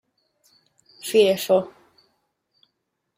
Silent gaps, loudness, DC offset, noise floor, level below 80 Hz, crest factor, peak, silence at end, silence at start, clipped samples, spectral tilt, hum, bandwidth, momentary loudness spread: none; -20 LUFS; under 0.1%; -77 dBFS; -72 dBFS; 20 dB; -6 dBFS; 1.5 s; 1.05 s; under 0.1%; -4 dB/octave; none; 16 kHz; 18 LU